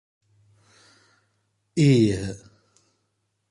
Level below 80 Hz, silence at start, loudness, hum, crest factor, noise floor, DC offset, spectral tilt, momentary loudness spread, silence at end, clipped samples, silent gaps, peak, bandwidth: -52 dBFS; 1.75 s; -22 LUFS; none; 18 dB; -74 dBFS; under 0.1%; -7 dB/octave; 18 LU; 1.15 s; under 0.1%; none; -8 dBFS; 11 kHz